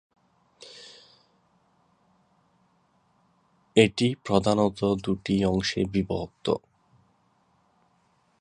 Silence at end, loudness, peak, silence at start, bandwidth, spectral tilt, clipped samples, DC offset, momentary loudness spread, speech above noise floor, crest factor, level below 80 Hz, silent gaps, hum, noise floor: 1.85 s; -25 LUFS; -4 dBFS; 0.65 s; 10.5 kHz; -6 dB/octave; under 0.1%; under 0.1%; 23 LU; 43 dB; 26 dB; -52 dBFS; none; none; -67 dBFS